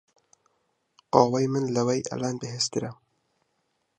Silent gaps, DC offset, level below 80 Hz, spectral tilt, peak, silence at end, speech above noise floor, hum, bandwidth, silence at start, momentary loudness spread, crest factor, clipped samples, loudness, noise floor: none; under 0.1%; -66 dBFS; -5 dB/octave; -4 dBFS; 1.05 s; 50 dB; none; 9.6 kHz; 1.15 s; 10 LU; 26 dB; under 0.1%; -26 LUFS; -75 dBFS